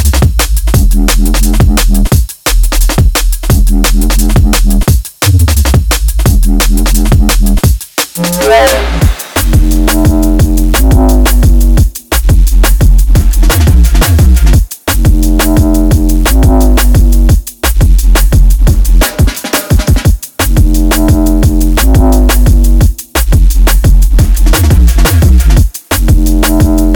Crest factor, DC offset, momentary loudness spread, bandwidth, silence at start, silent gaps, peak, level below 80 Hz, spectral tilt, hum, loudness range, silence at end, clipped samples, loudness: 6 dB; under 0.1%; 4 LU; 19.5 kHz; 0 s; none; 0 dBFS; -8 dBFS; -5 dB/octave; none; 1 LU; 0 s; 0.4%; -9 LUFS